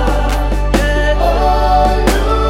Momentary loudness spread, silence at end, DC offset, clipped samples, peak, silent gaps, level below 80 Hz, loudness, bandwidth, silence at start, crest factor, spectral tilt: 4 LU; 0 s; under 0.1%; under 0.1%; 0 dBFS; none; -14 dBFS; -14 LUFS; 15.5 kHz; 0 s; 12 dB; -5.5 dB/octave